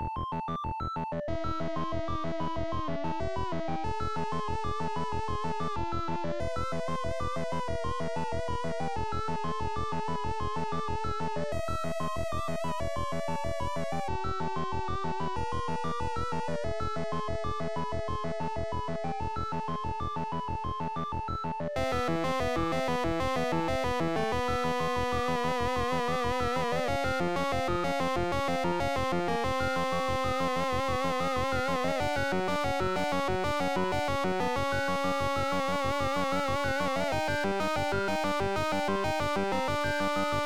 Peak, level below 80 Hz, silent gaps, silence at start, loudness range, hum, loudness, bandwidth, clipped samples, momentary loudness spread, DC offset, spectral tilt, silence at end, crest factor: -18 dBFS; -46 dBFS; none; 0 s; 4 LU; none; -31 LUFS; 18.5 kHz; under 0.1%; 5 LU; 1%; -5.5 dB/octave; 0 s; 14 dB